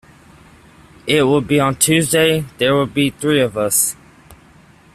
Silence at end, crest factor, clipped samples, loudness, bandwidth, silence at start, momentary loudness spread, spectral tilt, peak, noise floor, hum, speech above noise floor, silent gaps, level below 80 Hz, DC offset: 0.6 s; 18 dB; under 0.1%; -15 LUFS; 16 kHz; 1.05 s; 5 LU; -3.5 dB/octave; 0 dBFS; -47 dBFS; none; 31 dB; none; -50 dBFS; under 0.1%